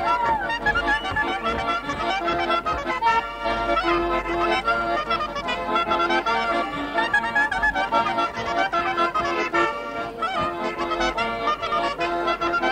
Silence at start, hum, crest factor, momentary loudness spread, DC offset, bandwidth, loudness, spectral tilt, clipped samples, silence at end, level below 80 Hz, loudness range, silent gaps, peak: 0 s; none; 16 dB; 4 LU; under 0.1%; 15.5 kHz; -23 LUFS; -4 dB/octave; under 0.1%; 0 s; -44 dBFS; 2 LU; none; -8 dBFS